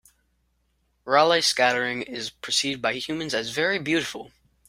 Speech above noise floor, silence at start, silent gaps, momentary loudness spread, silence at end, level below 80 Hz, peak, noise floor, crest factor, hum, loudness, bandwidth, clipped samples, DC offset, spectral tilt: 46 dB; 1.05 s; none; 13 LU; 0.4 s; -64 dBFS; -4 dBFS; -70 dBFS; 22 dB; none; -23 LUFS; 16 kHz; under 0.1%; under 0.1%; -2.5 dB/octave